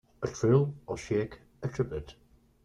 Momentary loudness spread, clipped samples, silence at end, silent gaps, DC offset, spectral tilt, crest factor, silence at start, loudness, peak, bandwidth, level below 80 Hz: 14 LU; under 0.1%; 0.55 s; none; under 0.1%; -7.5 dB/octave; 18 dB; 0.2 s; -31 LUFS; -12 dBFS; 10 kHz; -54 dBFS